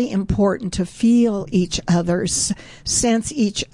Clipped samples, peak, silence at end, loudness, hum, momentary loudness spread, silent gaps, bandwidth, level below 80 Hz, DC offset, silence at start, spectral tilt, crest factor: under 0.1%; -6 dBFS; 0.1 s; -19 LUFS; none; 6 LU; none; 11.5 kHz; -38 dBFS; 0.2%; 0 s; -4.5 dB/octave; 12 dB